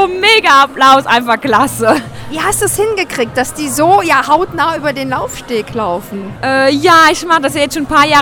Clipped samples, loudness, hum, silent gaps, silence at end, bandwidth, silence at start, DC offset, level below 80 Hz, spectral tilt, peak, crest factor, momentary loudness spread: 0.3%; -11 LUFS; none; none; 0 s; over 20 kHz; 0 s; under 0.1%; -40 dBFS; -3 dB/octave; 0 dBFS; 12 dB; 11 LU